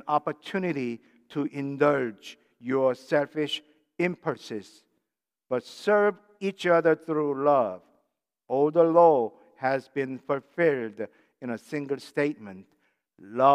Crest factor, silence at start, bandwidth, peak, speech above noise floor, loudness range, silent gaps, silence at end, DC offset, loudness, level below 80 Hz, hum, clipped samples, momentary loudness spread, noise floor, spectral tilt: 20 dB; 0.05 s; 12 kHz; -6 dBFS; 61 dB; 6 LU; none; 0 s; under 0.1%; -26 LUFS; -84 dBFS; none; under 0.1%; 16 LU; -87 dBFS; -6.5 dB/octave